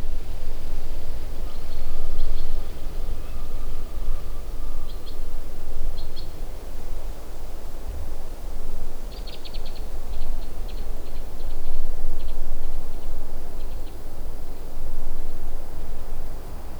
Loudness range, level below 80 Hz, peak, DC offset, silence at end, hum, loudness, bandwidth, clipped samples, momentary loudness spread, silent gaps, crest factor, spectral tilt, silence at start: 3 LU; -24 dBFS; -4 dBFS; under 0.1%; 0 s; none; -36 LUFS; 4.6 kHz; under 0.1%; 6 LU; none; 12 dB; -5.5 dB/octave; 0 s